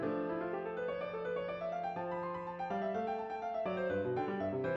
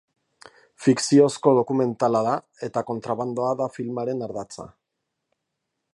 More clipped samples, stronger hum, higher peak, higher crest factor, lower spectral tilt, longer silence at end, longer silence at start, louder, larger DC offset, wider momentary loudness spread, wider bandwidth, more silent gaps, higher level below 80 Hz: neither; neither; second, -24 dBFS vs -4 dBFS; second, 12 dB vs 20 dB; first, -8 dB/octave vs -6 dB/octave; second, 0 s vs 1.25 s; second, 0 s vs 0.8 s; second, -38 LUFS vs -23 LUFS; neither; second, 4 LU vs 12 LU; second, 7.4 kHz vs 11.5 kHz; neither; about the same, -70 dBFS vs -68 dBFS